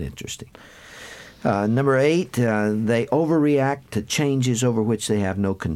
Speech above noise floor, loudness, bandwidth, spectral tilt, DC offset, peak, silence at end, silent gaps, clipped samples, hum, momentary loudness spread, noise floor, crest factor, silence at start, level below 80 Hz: 20 dB; -21 LUFS; 15.5 kHz; -5.5 dB/octave; under 0.1%; -6 dBFS; 0 s; none; under 0.1%; none; 15 LU; -41 dBFS; 14 dB; 0 s; -52 dBFS